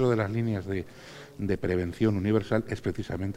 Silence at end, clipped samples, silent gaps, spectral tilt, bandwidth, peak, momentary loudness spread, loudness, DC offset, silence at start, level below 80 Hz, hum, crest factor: 0 s; under 0.1%; none; -8 dB/octave; 15 kHz; -10 dBFS; 11 LU; -29 LUFS; under 0.1%; 0 s; -52 dBFS; none; 18 dB